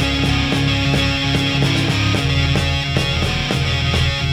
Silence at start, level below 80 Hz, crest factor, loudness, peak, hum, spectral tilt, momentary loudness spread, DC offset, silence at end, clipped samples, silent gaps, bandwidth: 0 s; -26 dBFS; 14 dB; -17 LUFS; -4 dBFS; none; -5 dB/octave; 2 LU; under 0.1%; 0 s; under 0.1%; none; 15.5 kHz